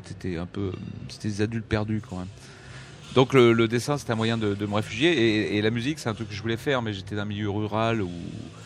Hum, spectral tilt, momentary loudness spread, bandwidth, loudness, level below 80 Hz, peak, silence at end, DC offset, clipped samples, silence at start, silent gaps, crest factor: none; -6 dB/octave; 16 LU; 13.5 kHz; -25 LUFS; -52 dBFS; -4 dBFS; 0 s; under 0.1%; under 0.1%; 0 s; none; 22 dB